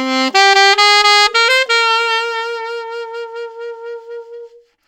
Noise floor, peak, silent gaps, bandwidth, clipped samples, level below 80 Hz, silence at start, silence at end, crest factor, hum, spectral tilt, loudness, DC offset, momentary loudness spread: -38 dBFS; -2 dBFS; none; 19 kHz; under 0.1%; -62 dBFS; 0 s; 0.4 s; 14 dB; none; 1.5 dB/octave; -10 LUFS; under 0.1%; 20 LU